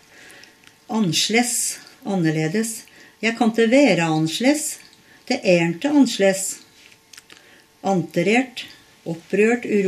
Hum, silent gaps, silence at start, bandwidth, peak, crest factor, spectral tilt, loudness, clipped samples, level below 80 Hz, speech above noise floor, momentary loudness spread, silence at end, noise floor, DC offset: none; none; 0.9 s; 14 kHz; -4 dBFS; 18 dB; -4 dB/octave; -20 LUFS; under 0.1%; -68 dBFS; 31 dB; 16 LU; 0 s; -51 dBFS; under 0.1%